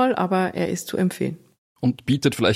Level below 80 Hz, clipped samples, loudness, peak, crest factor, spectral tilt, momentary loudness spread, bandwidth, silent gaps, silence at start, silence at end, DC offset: -58 dBFS; under 0.1%; -23 LUFS; -4 dBFS; 18 dB; -5.5 dB/octave; 9 LU; 15.5 kHz; 1.58-1.76 s; 0 s; 0 s; under 0.1%